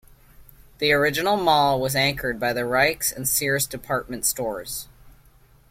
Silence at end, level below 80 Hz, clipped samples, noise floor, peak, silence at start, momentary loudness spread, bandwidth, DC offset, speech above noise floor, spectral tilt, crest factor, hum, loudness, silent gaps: 0.6 s; -50 dBFS; under 0.1%; -54 dBFS; -4 dBFS; 0.4 s; 9 LU; 16.5 kHz; under 0.1%; 32 dB; -2.5 dB/octave; 20 dB; none; -22 LUFS; none